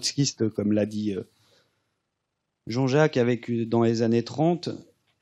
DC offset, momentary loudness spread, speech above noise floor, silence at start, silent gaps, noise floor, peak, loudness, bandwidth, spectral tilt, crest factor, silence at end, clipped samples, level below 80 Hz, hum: under 0.1%; 10 LU; 56 dB; 0 s; none; -80 dBFS; -8 dBFS; -25 LUFS; 12.5 kHz; -5.5 dB/octave; 18 dB; 0.4 s; under 0.1%; -74 dBFS; none